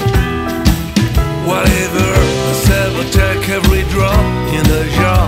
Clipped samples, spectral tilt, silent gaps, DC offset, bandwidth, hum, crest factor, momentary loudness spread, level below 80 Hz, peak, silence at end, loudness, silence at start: under 0.1%; -5.5 dB/octave; none; under 0.1%; 16.5 kHz; none; 12 dB; 3 LU; -18 dBFS; 0 dBFS; 0 s; -13 LUFS; 0 s